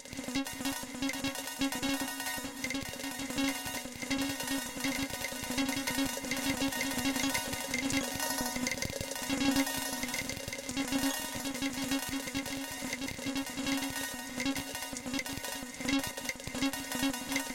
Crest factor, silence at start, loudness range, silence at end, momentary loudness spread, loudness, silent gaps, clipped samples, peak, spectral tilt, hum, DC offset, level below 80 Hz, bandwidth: 20 dB; 0 s; 3 LU; 0 s; 5 LU; -34 LUFS; none; under 0.1%; -14 dBFS; -2.5 dB/octave; none; under 0.1%; -56 dBFS; 17 kHz